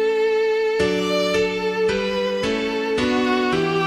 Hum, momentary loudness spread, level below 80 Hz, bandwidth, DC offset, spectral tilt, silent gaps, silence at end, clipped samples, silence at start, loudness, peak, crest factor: none; 3 LU; -48 dBFS; 13.5 kHz; under 0.1%; -5 dB/octave; none; 0 s; under 0.1%; 0 s; -20 LUFS; -8 dBFS; 12 dB